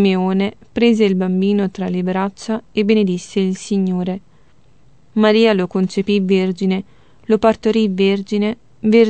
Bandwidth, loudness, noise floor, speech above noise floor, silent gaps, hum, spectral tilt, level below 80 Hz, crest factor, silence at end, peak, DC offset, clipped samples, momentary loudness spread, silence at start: 8.8 kHz; -17 LUFS; -53 dBFS; 38 dB; none; none; -7 dB/octave; -54 dBFS; 16 dB; 0 s; -2 dBFS; 0.5%; under 0.1%; 8 LU; 0 s